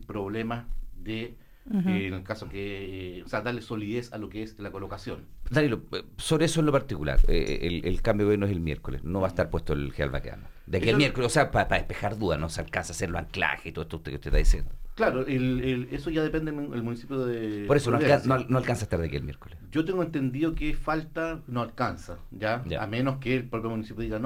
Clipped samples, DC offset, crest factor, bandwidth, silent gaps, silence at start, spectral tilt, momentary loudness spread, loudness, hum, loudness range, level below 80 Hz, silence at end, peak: under 0.1%; under 0.1%; 20 dB; 16 kHz; none; 0 s; -6 dB/octave; 13 LU; -29 LUFS; none; 6 LU; -34 dBFS; 0 s; -8 dBFS